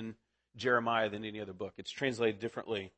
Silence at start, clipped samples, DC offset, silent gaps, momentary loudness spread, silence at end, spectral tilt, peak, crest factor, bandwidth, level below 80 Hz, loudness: 0 s; under 0.1%; under 0.1%; none; 13 LU; 0.1 s; -5 dB/octave; -16 dBFS; 20 dB; 8.4 kHz; -74 dBFS; -35 LUFS